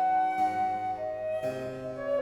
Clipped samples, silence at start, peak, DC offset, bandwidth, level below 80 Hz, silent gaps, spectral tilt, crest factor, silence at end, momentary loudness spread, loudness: under 0.1%; 0 s; -18 dBFS; under 0.1%; 12.5 kHz; -62 dBFS; none; -6 dB/octave; 12 dB; 0 s; 10 LU; -31 LUFS